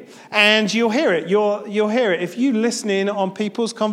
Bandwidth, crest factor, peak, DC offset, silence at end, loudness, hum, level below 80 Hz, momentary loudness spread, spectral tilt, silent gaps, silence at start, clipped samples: 15.5 kHz; 18 dB; 0 dBFS; under 0.1%; 0 s; -18 LUFS; none; -72 dBFS; 9 LU; -4 dB/octave; none; 0 s; under 0.1%